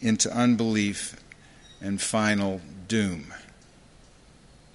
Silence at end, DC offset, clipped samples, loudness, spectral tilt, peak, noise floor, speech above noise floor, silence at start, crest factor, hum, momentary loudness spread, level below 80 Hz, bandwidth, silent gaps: 1.3 s; under 0.1%; under 0.1%; -26 LUFS; -4 dB/octave; -8 dBFS; -54 dBFS; 28 dB; 0 s; 20 dB; none; 16 LU; -54 dBFS; 11.5 kHz; none